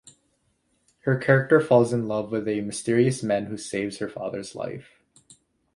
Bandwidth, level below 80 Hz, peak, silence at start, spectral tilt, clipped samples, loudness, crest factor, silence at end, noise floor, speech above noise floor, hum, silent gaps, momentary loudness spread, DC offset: 11.5 kHz; -64 dBFS; -4 dBFS; 1.05 s; -6 dB/octave; under 0.1%; -24 LUFS; 22 dB; 0.95 s; -70 dBFS; 46 dB; none; none; 14 LU; under 0.1%